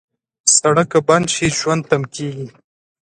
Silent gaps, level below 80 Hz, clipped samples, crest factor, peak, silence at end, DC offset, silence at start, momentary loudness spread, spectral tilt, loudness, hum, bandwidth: none; -52 dBFS; under 0.1%; 18 dB; 0 dBFS; 0.6 s; under 0.1%; 0.45 s; 14 LU; -3.5 dB/octave; -15 LUFS; none; 11 kHz